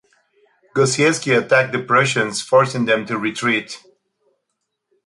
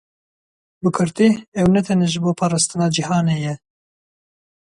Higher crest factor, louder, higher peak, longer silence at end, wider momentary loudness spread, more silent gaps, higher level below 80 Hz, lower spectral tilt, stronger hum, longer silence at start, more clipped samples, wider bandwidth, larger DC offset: about the same, 16 dB vs 16 dB; about the same, -17 LUFS vs -18 LUFS; about the same, -2 dBFS vs -4 dBFS; first, 1.3 s vs 1.15 s; about the same, 7 LU vs 7 LU; second, none vs 1.48-1.52 s; second, -62 dBFS vs -50 dBFS; second, -4 dB/octave vs -5.5 dB/octave; neither; about the same, 0.75 s vs 0.85 s; neither; about the same, 11.5 kHz vs 11.5 kHz; neither